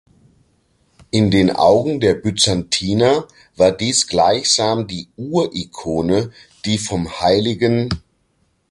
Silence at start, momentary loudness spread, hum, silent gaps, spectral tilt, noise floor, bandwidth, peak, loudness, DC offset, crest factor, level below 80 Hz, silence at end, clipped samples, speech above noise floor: 1.15 s; 9 LU; none; none; -4.5 dB/octave; -63 dBFS; 11.5 kHz; -2 dBFS; -17 LUFS; under 0.1%; 16 dB; -42 dBFS; 0.7 s; under 0.1%; 47 dB